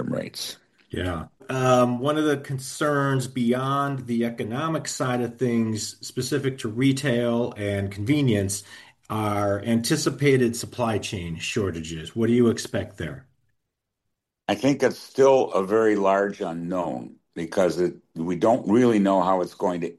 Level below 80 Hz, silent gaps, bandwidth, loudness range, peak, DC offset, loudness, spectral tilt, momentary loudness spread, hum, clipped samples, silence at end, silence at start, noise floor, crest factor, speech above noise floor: -56 dBFS; none; 12.5 kHz; 3 LU; -6 dBFS; under 0.1%; -24 LUFS; -5.5 dB/octave; 12 LU; none; under 0.1%; 0.05 s; 0 s; -80 dBFS; 16 dB; 57 dB